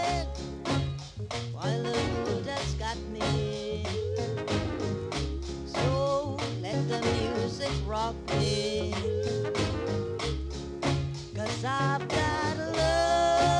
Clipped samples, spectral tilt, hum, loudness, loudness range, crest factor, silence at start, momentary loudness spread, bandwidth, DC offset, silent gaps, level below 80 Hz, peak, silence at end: under 0.1%; -5.5 dB/octave; none; -30 LUFS; 2 LU; 16 dB; 0 s; 7 LU; 11.5 kHz; under 0.1%; none; -42 dBFS; -14 dBFS; 0 s